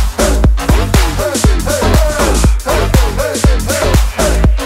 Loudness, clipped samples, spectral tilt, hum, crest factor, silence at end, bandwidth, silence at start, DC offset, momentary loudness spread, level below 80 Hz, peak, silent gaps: -12 LUFS; under 0.1%; -5 dB/octave; none; 10 dB; 0 s; 16.5 kHz; 0 s; under 0.1%; 2 LU; -12 dBFS; 0 dBFS; none